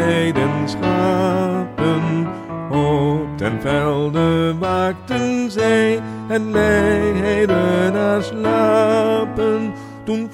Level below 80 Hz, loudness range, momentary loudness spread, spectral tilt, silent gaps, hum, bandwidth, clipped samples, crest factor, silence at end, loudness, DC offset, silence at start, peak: -42 dBFS; 3 LU; 7 LU; -6.5 dB/octave; none; none; 16 kHz; under 0.1%; 16 dB; 0 s; -18 LUFS; under 0.1%; 0 s; -2 dBFS